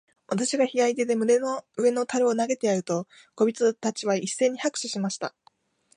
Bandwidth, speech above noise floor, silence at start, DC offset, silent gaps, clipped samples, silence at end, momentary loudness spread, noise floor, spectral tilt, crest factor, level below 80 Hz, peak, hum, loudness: 11 kHz; 38 dB; 0.3 s; under 0.1%; none; under 0.1%; 0.7 s; 8 LU; -63 dBFS; -4 dB/octave; 16 dB; -78 dBFS; -10 dBFS; none; -25 LUFS